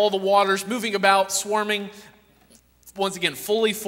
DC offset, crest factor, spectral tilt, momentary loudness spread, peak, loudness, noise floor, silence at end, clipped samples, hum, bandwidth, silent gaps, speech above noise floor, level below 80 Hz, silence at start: under 0.1%; 20 dB; -2.5 dB/octave; 9 LU; -4 dBFS; -22 LUFS; -56 dBFS; 0 s; under 0.1%; none; 16 kHz; none; 34 dB; -66 dBFS; 0 s